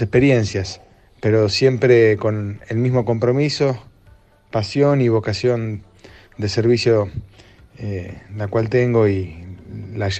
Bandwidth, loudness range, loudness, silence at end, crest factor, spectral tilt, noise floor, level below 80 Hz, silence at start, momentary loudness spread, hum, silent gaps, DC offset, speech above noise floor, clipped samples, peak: 8.6 kHz; 4 LU; -18 LUFS; 0 s; 16 dB; -6.5 dB/octave; -50 dBFS; -48 dBFS; 0 s; 17 LU; none; none; under 0.1%; 32 dB; under 0.1%; -2 dBFS